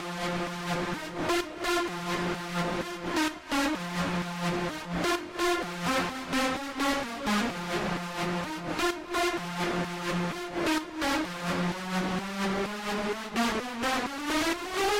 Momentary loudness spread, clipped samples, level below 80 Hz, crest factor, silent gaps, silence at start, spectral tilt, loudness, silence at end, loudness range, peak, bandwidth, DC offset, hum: 3 LU; under 0.1%; -52 dBFS; 12 dB; none; 0 s; -4 dB/octave; -30 LUFS; 0 s; 1 LU; -18 dBFS; 16 kHz; under 0.1%; none